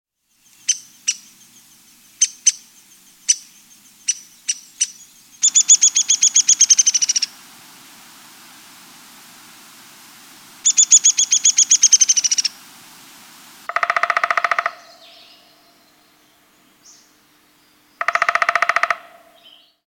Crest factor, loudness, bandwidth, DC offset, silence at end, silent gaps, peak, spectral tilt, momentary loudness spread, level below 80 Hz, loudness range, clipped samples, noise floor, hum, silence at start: 20 dB; -14 LUFS; 17 kHz; under 0.1%; 0.9 s; none; 0 dBFS; 4 dB/octave; 15 LU; -78 dBFS; 11 LU; under 0.1%; -57 dBFS; none; 0.7 s